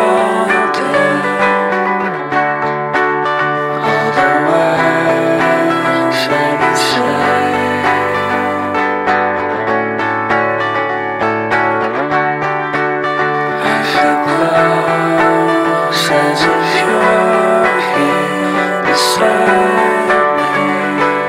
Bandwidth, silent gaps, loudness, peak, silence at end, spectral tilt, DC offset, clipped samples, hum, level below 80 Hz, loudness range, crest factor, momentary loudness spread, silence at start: 16 kHz; none; -13 LUFS; 0 dBFS; 0 s; -4.5 dB/octave; under 0.1%; under 0.1%; none; -52 dBFS; 3 LU; 12 dB; 4 LU; 0 s